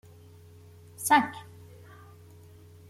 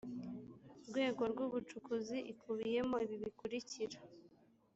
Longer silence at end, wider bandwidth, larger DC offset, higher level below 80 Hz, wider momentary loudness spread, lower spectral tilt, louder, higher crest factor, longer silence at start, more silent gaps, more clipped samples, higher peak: first, 1.5 s vs 0.5 s; first, 16 kHz vs 8.2 kHz; neither; first, -70 dBFS vs -76 dBFS; first, 28 LU vs 15 LU; second, -3 dB/octave vs -5 dB/octave; first, -26 LUFS vs -42 LUFS; first, 24 dB vs 18 dB; first, 1 s vs 0.05 s; neither; neither; first, -8 dBFS vs -26 dBFS